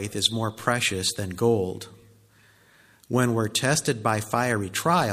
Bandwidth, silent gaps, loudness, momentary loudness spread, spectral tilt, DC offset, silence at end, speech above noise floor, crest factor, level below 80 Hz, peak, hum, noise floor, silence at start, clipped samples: 15.5 kHz; none; -24 LUFS; 5 LU; -4 dB/octave; under 0.1%; 0 s; 33 dB; 20 dB; -60 dBFS; -6 dBFS; none; -57 dBFS; 0 s; under 0.1%